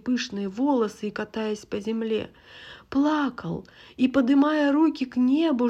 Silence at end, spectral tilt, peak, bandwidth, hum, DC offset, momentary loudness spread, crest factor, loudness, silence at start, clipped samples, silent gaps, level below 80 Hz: 0 s; -6 dB/octave; -10 dBFS; 8.4 kHz; none; under 0.1%; 14 LU; 14 dB; -25 LUFS; 0.05 s; under 0.1%; none; -60 dBFS